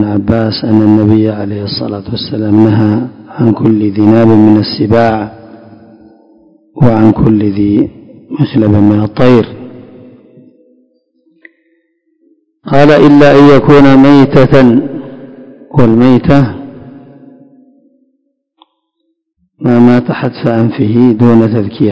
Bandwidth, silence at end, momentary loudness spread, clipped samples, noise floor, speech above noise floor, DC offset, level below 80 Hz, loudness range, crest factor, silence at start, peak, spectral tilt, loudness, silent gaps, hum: 8 kHz; 0 s; 13 LU; 6%; -64 dBFS; 58 dB; under 0.1%; -36 dBFS; 9 LU; 8 dB; 0 s; 0 dBFS; -9 dB/octave; -8 LUFS; none; none